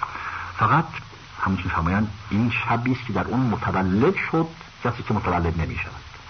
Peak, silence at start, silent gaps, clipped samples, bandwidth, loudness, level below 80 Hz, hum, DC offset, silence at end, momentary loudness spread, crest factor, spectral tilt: -6 dBFS; 0 s; none; under 0.1%; 6.6 kHz; -24 LUFS; -42 dBFS; none; under 0.1%; 0 s; 11 LU; 18 dB; -7.5 dB/octave